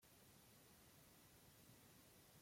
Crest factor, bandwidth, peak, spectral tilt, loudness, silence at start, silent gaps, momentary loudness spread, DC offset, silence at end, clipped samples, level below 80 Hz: 14 dB; 16.5 kHz; -54 dBFS; -3.5 dB/octave; -68 LUFS; 0 s; none; 1 LU; under 0.1%; 0 s; under 0.1%; -84 dBFS